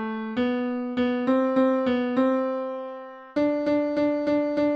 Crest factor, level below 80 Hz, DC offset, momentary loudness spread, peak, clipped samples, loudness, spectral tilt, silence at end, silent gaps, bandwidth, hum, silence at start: 14 dB; -62 dBFS; under 0.1%; 9 LU; -10 dBFS; under 0.1%; -25 LUFS; -7 dB/octave; 0 s; none; 6.2 kHz; none; 0 s